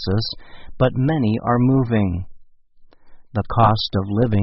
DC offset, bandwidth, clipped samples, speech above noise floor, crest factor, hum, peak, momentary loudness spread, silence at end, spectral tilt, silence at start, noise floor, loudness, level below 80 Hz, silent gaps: under 0.1%; 6 kHz; under 0.1%; 29 dB; 18 dB; none; -2 dBFS; 12 LU; 0 s; -6.5 dB/octave; 0 s; -47 dBFS; -20 LUFS; -40 dBFS; none